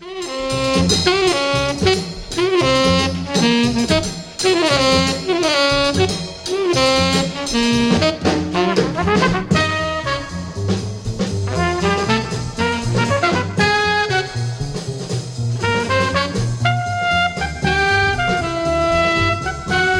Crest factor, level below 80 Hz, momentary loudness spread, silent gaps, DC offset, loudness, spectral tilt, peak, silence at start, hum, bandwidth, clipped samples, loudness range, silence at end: 16 dB; -36 dBFS; 9 LU; none; under 0.1%; -17 LUFS; -4.5 dB/octave; -2 dBFS; 0 s; none; 16 kHz; under 0.1%; 3 LU; 0 s